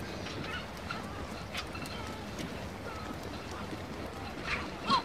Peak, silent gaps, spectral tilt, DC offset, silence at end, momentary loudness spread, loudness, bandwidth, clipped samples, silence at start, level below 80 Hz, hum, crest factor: -14 dBFS; none; -4.5 dB/octave; 0.2%; 0 s; 5 LU; -39 LUFS; 16.5 kHz; under 0.1%; 0 s; -52 dBFS; none; 24 dB